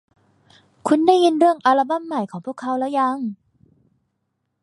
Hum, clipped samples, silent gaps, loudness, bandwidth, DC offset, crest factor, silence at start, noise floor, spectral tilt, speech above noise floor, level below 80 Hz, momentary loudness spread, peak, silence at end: none; under 0.1%; none; -19 LUFS; 11.5 kHz; under 0.1%; 18 dB; 0.85 s; -74 dBFS; -5 dB/octave; 56 dB; -72 dBFS; 14 LU; -2 dBFS; 1.3 s